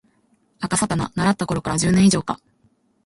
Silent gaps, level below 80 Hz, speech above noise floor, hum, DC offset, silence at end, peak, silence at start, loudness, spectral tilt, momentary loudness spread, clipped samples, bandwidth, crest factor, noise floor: none; -46 dBFS; 43 dB; none; under 0.1%; 0.7 s; -4 dBFS; 0.6 s; -20 LUFS; -5 dB/octave; 14 LU; under 0.1%; 11.5 kHz; 16 dB; -62 dBFS